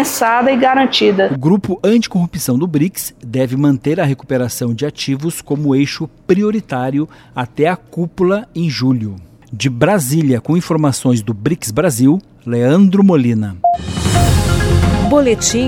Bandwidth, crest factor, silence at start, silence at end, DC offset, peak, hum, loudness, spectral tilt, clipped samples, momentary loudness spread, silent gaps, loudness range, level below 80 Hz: 17 kHz; 14 dB; 0 s; 0 s; under 0.1%; 0 dBFS; none; -14 LUFS; -5.5 dB/octave; under 0.1%; 8 LU; none; 4 LU; -30 dBFS